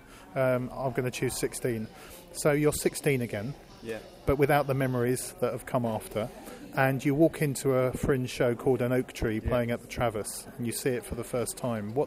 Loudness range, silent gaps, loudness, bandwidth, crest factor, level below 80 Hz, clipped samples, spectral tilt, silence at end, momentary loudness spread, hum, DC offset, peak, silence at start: 3 LU; none; -29 LUFS; 16 kHz; 20 dB; -48 dBFS; under 0.1%; -5.5 dB/octave; 0 s; 11 LU; none; under 0.1%; -8 dBFS; 0.05 s